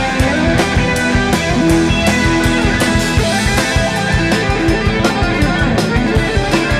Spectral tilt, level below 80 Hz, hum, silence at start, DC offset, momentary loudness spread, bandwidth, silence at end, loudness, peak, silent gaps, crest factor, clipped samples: -5 dB/octave; -22 dBFS; none; 0 s; under 0.1%; 2 LU; 15.5 kHz; 0 s; -13 LUFS; -4 dBFS; none; 10 dB; under 0.1%